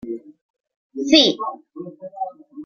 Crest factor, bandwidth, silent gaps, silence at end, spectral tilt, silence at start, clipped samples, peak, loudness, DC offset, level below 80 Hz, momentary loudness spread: 22 dB; 7.2 kHz; 0.41-0.54 s, 0.60-0.64 s, 0.76-0.90 s; 0 s; -3 dB/octave; 0.05 s; under 0.1%; 0 dBFS; -17 LUFS; under 0.1%; -64 dBFS; 23 LU